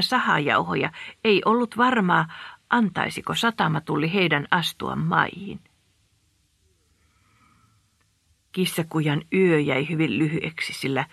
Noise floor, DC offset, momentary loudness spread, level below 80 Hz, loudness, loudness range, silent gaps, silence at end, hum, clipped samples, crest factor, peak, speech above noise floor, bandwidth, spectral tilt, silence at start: -66 dBFS; under 0.1%; 8 LU; -62 dBFS; -23 LUFS; 9 LU; none; 0.05 s; none; under 0.1%; 22 dB; -2 dBFS; 43 dB; 14 kHz; -5.5 dB/octave; 0 s